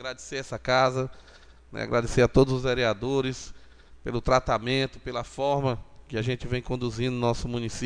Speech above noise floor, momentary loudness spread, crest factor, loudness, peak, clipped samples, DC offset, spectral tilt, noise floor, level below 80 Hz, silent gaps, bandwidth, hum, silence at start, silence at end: 22 dB; 13 LU; 22 dB; -27 LUFS; -6 dBFS; under 0.1%; 0.1%; -5.5 dB/octave; -48 dBFS; -42 dBFS; none; 10 kHz; none; 0 s; 0 s